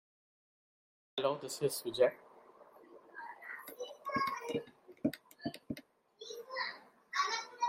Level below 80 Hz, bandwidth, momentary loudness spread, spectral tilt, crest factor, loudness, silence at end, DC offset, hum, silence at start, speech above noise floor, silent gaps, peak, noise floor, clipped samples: -78 dBFS; 16 kHz; 20 LU; -3.5 dB/octave; 22 dB; -38 LUFS; 0 s; under 0.1%; none; 1.15 s; 26 dB; none; -18 dBFS; -60 dBFS; under 0.1%